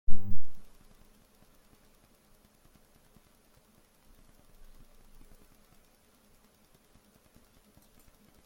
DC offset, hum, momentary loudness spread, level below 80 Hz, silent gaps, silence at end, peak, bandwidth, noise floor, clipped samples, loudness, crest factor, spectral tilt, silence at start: under 0.1%; none; 4 LU; -46 dBFS; none; 7.85 s; -6 dBFS; 16 kHz; -64 dBFS; under 0.1%; -56 LUFS; 20 dB; -6.5 dB/octave; 0.1 s